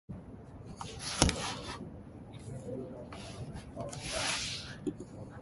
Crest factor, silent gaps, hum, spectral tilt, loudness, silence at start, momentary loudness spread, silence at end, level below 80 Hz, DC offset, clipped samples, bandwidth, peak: 34 dB; none; none; -3.5 dB/octave; -37 LUFS; 0.1 s; 18 LU; 0 s; -50 dBFS; under 0.1%; under 0.1%; 12 kHz; -4 dBFS